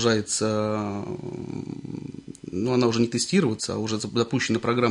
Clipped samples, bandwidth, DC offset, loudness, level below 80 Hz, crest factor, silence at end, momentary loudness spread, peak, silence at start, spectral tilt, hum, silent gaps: under 0.1%; 11 kHz; under 0.1%; -25 LUFS; -62 dBFS; 18 dB; 0 s; 13 LU; -8 dBFS; 0 s; -4.5 dB/octave; none; none